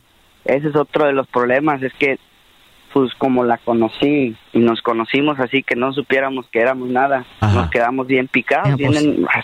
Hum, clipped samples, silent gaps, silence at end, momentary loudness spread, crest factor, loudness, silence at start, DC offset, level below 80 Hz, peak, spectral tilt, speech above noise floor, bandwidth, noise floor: none; under 0.1%; none; 0 s; 3 LU; 14 dB; -17 LUFS; 0.45 s; under 0.1%; -46 dBFS; -4 dBFS; -7 dB/octave; 34 dB; 11 kHz; -50 dBFS